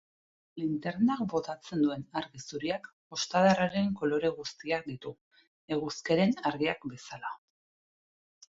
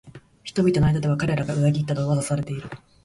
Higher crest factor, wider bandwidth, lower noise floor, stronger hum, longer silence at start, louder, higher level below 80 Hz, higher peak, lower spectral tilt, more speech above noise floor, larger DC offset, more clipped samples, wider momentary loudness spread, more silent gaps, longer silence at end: first, 20 dB vs 14 dB; second, 7.8 kHz vs 11.5 kHz; first, under -90 dBFS vs -43 dBFS; neither; first, 0.55 s vs 0.05 s; second, -31 LUFS vs -23 LUFS; second, -68 dBFS vs -44 dBFS; second, -12 dBFS vs -8 dBFS; second, -5.5 dB/octave vs -7 dB/octave; first, over 59 dB vs 21 dB; neither; neither; about the same, 15 LU vs 13 LU; first, 2.93-3.10 s, 5.21-5.31 s, 5.47-5.68 s vs none; first, 1.2 s vs 0.3 s